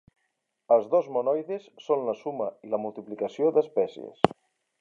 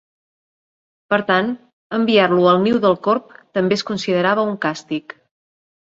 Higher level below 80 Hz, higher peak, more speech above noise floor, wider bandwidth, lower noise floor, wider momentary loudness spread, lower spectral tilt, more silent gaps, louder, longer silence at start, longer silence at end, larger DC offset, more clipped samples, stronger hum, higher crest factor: about the same, -64 dBFS vs -62 dBFS; about the same, 0 dBFS vs -2 dBFS; second, 52 dB vs over 73 dB; about the same, 7.6 kHz vs 7.8 kHz; second, -78 dBFS vs under -90 dBFS; about the same, 10 LU vs 12 LU; about the same, -7 dB/octave vs -6 dB/octave; second, none vs 1.73-1.90 s; second, -27 LUFS vs -18 LUFS; second, 0.7 s vs 1.1 s; second, 0.55 s vs 0.85 s; neither; neither; neither; first, 28 dB vs 18 dB